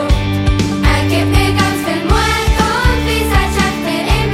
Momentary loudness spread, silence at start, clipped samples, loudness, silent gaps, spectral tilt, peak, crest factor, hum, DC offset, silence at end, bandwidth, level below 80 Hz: 3 LU; 0 s; under 0.1%; -14 LUFS; none; -5 dB/octave; 0 dBFS; 12 dB; none; under 0.1%; 0 s; 16 kHz; -18 dBFS